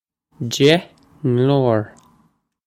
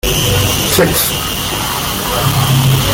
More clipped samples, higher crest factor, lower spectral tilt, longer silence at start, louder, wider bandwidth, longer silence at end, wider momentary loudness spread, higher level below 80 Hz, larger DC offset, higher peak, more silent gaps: neither; first, 18 dB vs 12 dB; first, -6 dB/octave vs -3.5 dB/octave; first, 0.4 s vs 0.05 s; second, -18 LUFS vs -12 LUFS; about the same, 15.5 kHz vs 17 kHz; first, 0.8 s vs 0 s; first, 13 LU vs 5 LU; second, -58 dBFS vs -28 dBFS; neither; about the same, 0 dBFS vs 0 dBFS; neither